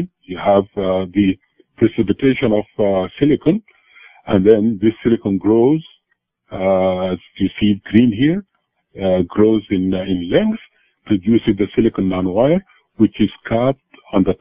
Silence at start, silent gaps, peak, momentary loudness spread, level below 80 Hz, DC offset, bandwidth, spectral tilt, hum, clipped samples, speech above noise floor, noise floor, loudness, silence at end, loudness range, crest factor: 0 s; none; 0 dBFS; 8 LU; -42 dBFS; under 0.1%; 5 kHz; -11 dB/octave; none; under 0.1%; 54 dB; -69 dBFS; -17 LUFS; 0.05 s; 2 LU; 16 dB